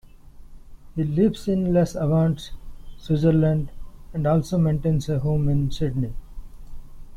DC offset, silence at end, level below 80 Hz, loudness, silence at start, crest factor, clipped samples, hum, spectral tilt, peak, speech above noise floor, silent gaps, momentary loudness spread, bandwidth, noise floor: under 0.1%; 0 s; -38 dBFS; -23 LUFS; 0.25 s; 16 dB; under 0.1%; none; -8.5 dB/octave; -8 dBFS; 22 dB; none; 14 LU; 11 kHz; -43 dBFS